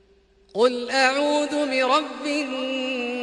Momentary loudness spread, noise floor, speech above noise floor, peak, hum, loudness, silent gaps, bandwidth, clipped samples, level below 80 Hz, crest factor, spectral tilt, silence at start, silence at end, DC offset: 7 LU; -58 dBFS; 35 dB; -6 dBFS; none; -22 LUFS; none; 11.5 kHz; under 0.1%; -66 dBFS; 18 dB; -2 dB/octave; 0.55 s; 0 s; under 0.1%